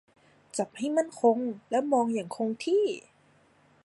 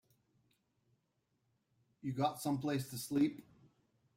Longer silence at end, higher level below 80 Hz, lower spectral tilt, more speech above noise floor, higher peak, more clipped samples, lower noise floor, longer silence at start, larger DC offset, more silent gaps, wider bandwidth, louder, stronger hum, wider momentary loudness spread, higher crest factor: about the same, 0.85 s vs 0.75 s; about the same, -80 dBFS vs -76 dBFS; about the same, -5 dB/octave vs -6 dB/octave; second, 35 dB vs 45 dB; first, -12 dBFS vs -22 dBFS; neither; second, -63 dBFS vs -82 dBFS; second, 0.55 s vs 2.05 s; neither; neither; second, 11.5 kHz vs 16 kHz; first, -28 LUFS vs -38 LUFS; neither; about the same, 9 LU vs 10 LU; about the same, 18 dB vs 20 dB